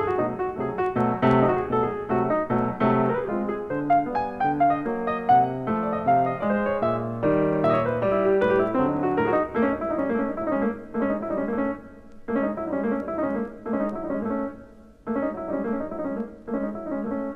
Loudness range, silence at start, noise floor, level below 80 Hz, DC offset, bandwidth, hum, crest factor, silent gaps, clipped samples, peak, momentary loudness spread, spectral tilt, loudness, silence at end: 6 LU; 0 s; -47 dBFS; -52 dBFS; under 0.1%; 6 kHz; none; 18 dB; none; under 0.1%; -6 dBFS; 9 LU; -9.5 dB/octave; -25 LUFS; 0 s